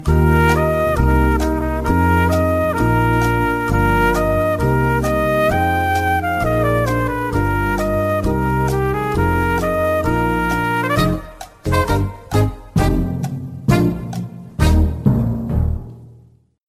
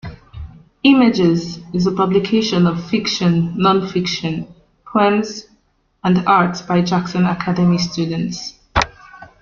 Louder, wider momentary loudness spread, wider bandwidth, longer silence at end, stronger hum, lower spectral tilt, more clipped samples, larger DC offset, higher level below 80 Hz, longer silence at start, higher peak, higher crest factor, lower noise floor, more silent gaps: about the same, -17 LUFS vs -17 LUFS; second, 5 LU vs 14 LU; first, 15.5 kHz vs 7.2 kHz; first, 0.55 s vs 0.15 s; neither; about the same, -7 dB/octave vs -6 dB/octave; neither; neither; first, -24 dBFS vs -42 dBFS; about the same, 0 s vs 0.05 s; about the same, -2 dBFS vs 0 dBFS; about the same, 14 dB vs 18 dB; second, -48 dBFS vs -59 dBFS; neither